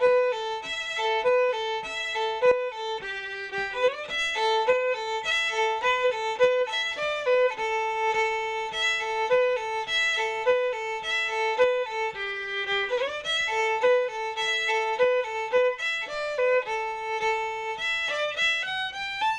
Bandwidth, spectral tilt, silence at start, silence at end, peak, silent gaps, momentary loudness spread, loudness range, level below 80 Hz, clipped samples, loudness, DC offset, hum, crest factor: 10.5 kHz; -0.5 dB/octave; 0 s; 0 s; -12 dBFS; none; 6 LU; 2 LU; -60 dBFS; under 0.1%; -26 LUFS; under 0.1%; none; 14 dB